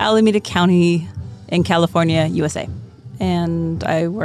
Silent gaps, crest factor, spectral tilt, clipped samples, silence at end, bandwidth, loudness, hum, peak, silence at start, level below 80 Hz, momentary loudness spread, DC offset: none; 14 dB; -6.5 dB/octave; under 0.1%; 0 s; 12 kHz; -17 LUFS; none; -2 dBFS; 0 s; -46 dBFS; 17 LU; under 0.1%